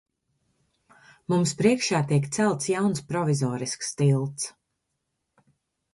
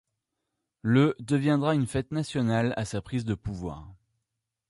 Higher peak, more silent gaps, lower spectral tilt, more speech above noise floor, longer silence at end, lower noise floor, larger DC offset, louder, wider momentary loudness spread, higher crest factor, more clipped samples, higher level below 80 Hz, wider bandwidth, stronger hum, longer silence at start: about the same, -8 dBFS vs -10 dBFS; neither; second, -5.5 dB/octave vs -7 dB/octave; about the same, 55 dB vs 58 dB; first, 1.45 s vs 0.75 s; second, -79 dBFS vs -84 dBFS; neither; about the same, -25 LUFS vs -27 LUFS; second, 9 LU vs 12 LU; about the same, 18 dB vs 18 dB; neither; second, -64 dBFS vs -52 dBFS; about the same, 11.5 kHz vs 11.5 kHz; neither; first, 1.3 s vs 0.85 s